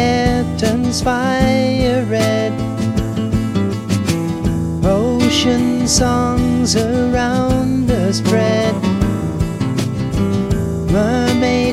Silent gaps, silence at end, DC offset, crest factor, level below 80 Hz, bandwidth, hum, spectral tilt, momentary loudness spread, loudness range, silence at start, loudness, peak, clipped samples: none; 0 s; under 0.1%; 14 dB; -30 dBFS; 15.5 kHz; none; -5.5 dB/octave; 5 LU; 2 LU; 0 s; -16 LUFS; -2 dBFS; under 0.1%